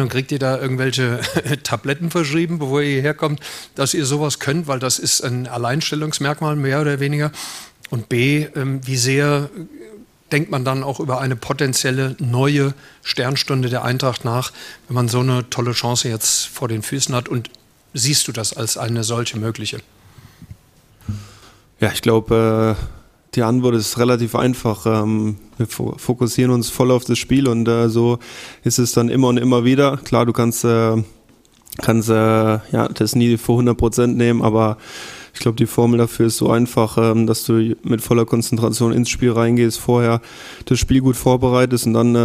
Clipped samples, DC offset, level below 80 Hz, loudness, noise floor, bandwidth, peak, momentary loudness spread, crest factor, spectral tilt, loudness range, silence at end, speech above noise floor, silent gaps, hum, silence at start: under 0.1%; under 0.1%; -42 dBFS; -18 LUFS; -51 dBFS; 15.5 kHz; 0 dBFS; 9 LU; 16 dB; -5 dB/octave; 4 LU; 0 s; 34 dB; none; none; 0 s